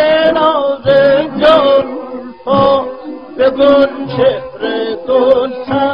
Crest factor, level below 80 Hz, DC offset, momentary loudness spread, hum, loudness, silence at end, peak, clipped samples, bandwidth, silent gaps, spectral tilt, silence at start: 12 dB; -44 dBFS; 0.5%; 14 LU; none; -11 LUFS; 0 s; 0 dBFS; under 0.1%; 5.4 kHz; none; -7.5 dB/octave; 0 s